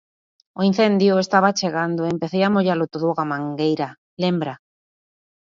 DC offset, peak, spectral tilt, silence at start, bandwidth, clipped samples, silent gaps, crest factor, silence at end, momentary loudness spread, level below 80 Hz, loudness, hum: under 0.1%; -2 dBFS; -6 dB/octave; 0.55 s; 7.4 kHz; under 0.1%; 3.98-4.17 s; 18 dB; 0.85 s; 9 LU; -66 dBFS; -20 LUFS; none